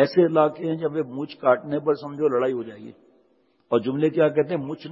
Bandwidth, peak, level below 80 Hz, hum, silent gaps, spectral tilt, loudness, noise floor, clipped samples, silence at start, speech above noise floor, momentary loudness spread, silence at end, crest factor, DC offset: 7.2 kHz; -4 dBFS; -72 dBFS; none; none; -9 dB/octave; -23 LUFS; -64 dBFS; under 0.1%; 0 s; 41 dB; 10 LU; 0 s; 18 dB; under 0.1%